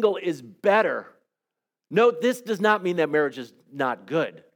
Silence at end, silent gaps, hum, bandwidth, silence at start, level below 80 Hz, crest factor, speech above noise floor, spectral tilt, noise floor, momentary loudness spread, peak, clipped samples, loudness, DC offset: 0.2 s; none; none; 19 kHz; 0 s; -84 dBFS; 18 dB; 63 dB; -5.5 dB/octave; -87 dBFS; 9 LU; -6 dBFS; under 0.1%; -24 LUFS; under 0.1%